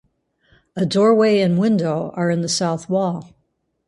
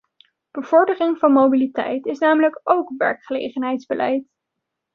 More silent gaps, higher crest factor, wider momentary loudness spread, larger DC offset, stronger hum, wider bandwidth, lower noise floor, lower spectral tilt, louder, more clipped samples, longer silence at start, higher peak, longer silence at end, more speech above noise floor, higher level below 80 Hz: neither; about the same, 16 dB vs 18 dB; about the same, 10 LU vs 11 LU; neither; neither; first, 11.5 kHz vs 6.6 kHz; second, -68 dBFS vs -80 dBFS; about the same, -5.5 dB/octave vs -6 dB/octave; about the same, -18 LUFS vs -19 LUFS; neither; first, 0.75 s vs 0.55 s; about the same, -4 dBFS vs -2 dBFS; about the same, 0.65 s vs 0.7 s; second, 51 dB vs 62 dB; first, -62 dBFS vs -70 dBFS